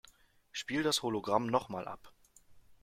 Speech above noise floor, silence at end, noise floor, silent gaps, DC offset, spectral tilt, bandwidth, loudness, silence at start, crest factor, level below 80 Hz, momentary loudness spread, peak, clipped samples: 29 dB; 0.1 s; -63 dBFS; none; under 0.1%; -3.5 dB/octave; 16.5 kHz; -34 LUFS; 0.55 s; 22 dB; -68 dBFS; 14 LU; -14 dBFS; under 0.1%